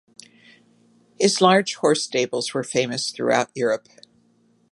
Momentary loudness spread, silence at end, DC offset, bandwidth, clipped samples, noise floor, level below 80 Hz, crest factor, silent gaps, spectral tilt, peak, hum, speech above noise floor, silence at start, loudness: 8 LU; 0.95 s; under 0.1%; 11.5 kHz; under 0.1%; -61 dBFS; -70 dBFS; 22 dB; none; -3.5 dB/octave; -2 dBFS; none; 40 dB; 1.2 s; -21 LUFS